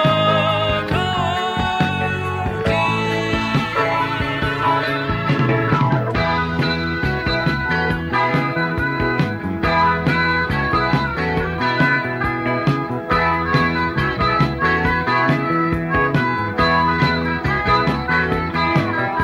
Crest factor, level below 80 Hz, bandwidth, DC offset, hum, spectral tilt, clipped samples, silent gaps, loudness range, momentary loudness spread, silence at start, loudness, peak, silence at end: 14 dB; -36 dBFS; 16 kHz; under 0.1%; none; -6.5 dB/octave; under 0.1%; none; 2 LU; 4 LU; 0 s; -18 LUFS; -4 dBFS; 0 s